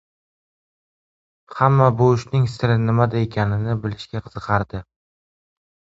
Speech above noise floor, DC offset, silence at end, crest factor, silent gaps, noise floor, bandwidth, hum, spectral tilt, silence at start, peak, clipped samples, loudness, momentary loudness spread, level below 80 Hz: over 71 dB; under 0.1%; 1.1 s; 20 dB; none; under -90 dBFS; 7.8 kHz; none; -8 dB/octave; 1.5 s; 0 dBFS; under 0.1%; -19 LUFS; 15 LU; -46 dBFS